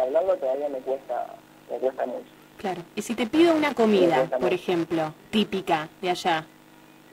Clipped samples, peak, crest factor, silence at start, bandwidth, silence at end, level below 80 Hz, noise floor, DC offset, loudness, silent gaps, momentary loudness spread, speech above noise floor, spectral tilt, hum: under 0.1%; -8 dBFS; 18 dB; 0 s; 16 kHz; 0.7 s; -64 dBFS; -52 dBFS; under 0.1%; -25 LUFS; none; 13 LU; 27 dB; -5.5 dB/octave; none